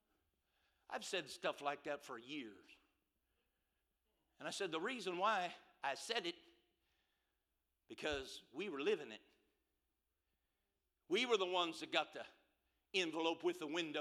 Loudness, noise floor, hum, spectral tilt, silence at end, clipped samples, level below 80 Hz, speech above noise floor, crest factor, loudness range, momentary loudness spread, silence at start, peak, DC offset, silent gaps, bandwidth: -42 LUFS; -89 dBFS; none; -3 dB/octave; 0 s; under 0.1%; -78 dBFS; 46 dB; 24 dB; 7 LU; 13 LU; 0.9 s; -20 dBFS; under 0.1%; none; 14.5 kHz